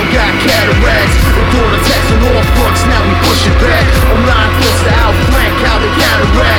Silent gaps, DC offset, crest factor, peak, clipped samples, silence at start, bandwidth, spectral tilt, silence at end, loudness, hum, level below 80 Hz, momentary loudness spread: none; under 0.1%; 8 dB; 0 dBFS; under 0.1%; 0 s; 18.5 kHz; -5 dB/octave; 0 s; -9 LUFS; none; -14 dBFS; 1 LU